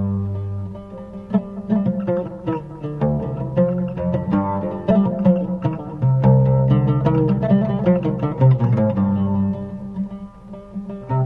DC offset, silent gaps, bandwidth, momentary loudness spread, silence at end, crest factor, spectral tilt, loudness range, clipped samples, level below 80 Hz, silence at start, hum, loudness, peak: under 0.1%; none; 4 kHz; 14 LU; 0 s; 14 dB; -11.5 dB/octave; 6 LU; under 0.1%; -42 dBFS; 0 s; none; -20 LUFS; -6 dBFS